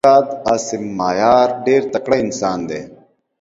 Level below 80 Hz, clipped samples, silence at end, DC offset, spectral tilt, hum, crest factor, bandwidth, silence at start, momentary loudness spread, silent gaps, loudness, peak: -52 dBFS; under 0.1%; 0.45 s; under 0.1%; -4.5 dB/octave; none; 16 dB; 8.2 kHz; 0.05 s; 11 LU; none; -16 LUFS; 0 dBFS